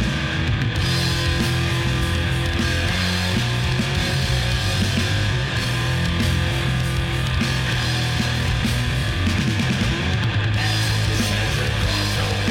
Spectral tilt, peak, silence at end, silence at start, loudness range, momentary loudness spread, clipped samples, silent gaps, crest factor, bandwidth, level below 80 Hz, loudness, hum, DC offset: -4.5 dB/octave; -8 dBFS; 0 s; 0 s; 1 LU; 1 LU; under 0.1%; none; 12 dB; 16.5 kHz; -30 dBFS; -21 LUFS; none; under 0.1%